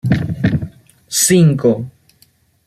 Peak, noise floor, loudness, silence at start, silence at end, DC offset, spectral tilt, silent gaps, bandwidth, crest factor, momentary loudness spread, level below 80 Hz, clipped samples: -2 dBFS; -54 dBFS; -14 LUFS; 0.05 s; 0.75 s; under 0.1%; -5 dB/octave; none; 15 kHz; 14 dB; 15 LU; -42 dBFS; under 0.1%